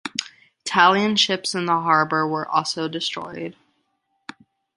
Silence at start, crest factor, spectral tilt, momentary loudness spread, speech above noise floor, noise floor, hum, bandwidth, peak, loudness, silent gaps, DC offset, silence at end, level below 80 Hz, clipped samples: 0.05 s; 22 dB; -3 dB/octave; 21 LU; 51 dB; -71 dBFS; none; 11.5 kHz; -2 dBFS; -20 LUFS; none; under 0.1%; 1.25 s; -68 dBFS; under 0.1%